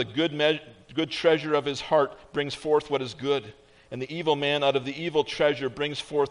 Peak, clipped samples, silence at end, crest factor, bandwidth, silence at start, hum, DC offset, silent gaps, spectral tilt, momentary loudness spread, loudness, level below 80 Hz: -8 dBFS; under 0.1%; 0 s; 18 dB; 10.5 kHz; 0 s; none; under 0.1%; none; -5 dB/octave; 8 LU; -26 LUFS; -62 dBFS